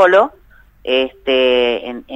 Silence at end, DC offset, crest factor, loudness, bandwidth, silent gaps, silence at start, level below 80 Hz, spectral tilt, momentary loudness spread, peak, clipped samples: 0 s; under 0.1%; 16 dB; -15 LUFS; 8 kHz; none; 0 s; -48 dBFS; -4 dB/octave; 10 LU; 0 dBFS; under 0.1%